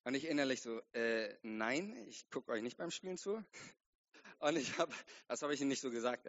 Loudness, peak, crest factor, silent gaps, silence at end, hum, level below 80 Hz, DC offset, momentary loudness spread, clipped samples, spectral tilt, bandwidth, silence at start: -41 LUFS; -20 dBFS; 20 dB; 3.86-4.04 s; 0 s; none; -86 dBFS; under 0.1%; 12 LU; under 0.1%; -2.5 dB/octave; 8 kHz; 0.05 s